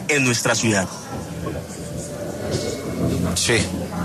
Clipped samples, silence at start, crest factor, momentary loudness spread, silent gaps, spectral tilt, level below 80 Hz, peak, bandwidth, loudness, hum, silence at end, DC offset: under 0.1%; 0 s; 16 dB; 13 LU; none; -4 dB/octave; -42 dBFS; -6 dBFS; 13.5 kHz; -22 LUFS; none; 0 s; under 0.1%